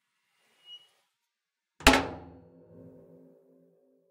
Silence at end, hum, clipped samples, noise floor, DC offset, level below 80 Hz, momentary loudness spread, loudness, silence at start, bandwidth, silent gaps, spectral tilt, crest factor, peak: 1.9 s; none; under 0.1%; -87 dBFS; under 0.1%; -44 dBFS; 27 LU; -24 LUFS; 0.7 s; 16 kHz; none; -3 dB/octave; 32 dB; -2 dBFS